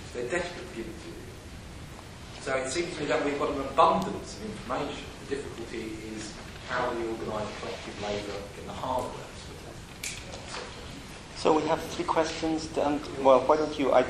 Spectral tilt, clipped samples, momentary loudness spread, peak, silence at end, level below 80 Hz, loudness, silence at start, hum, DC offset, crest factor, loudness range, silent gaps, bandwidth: -4.5 dB/octave; under 0.1%; 19 LU; -8 dBFS; 0 s; -50 dBFS; -30 LUFS; 0 s; none; under 0.1%; 22 dB; 8 LU; none; 14.5 kHz